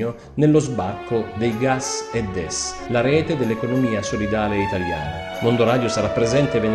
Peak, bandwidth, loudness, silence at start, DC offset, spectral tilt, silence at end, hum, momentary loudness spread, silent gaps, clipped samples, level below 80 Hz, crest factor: -4 dBFS; 12.5 kHz; -21 LUFS; 0 s; under 0.1%; -5.5 dB/octave; 0 s; none; 7 LU; none; under 0.1%; -42 dBFS; 16 dB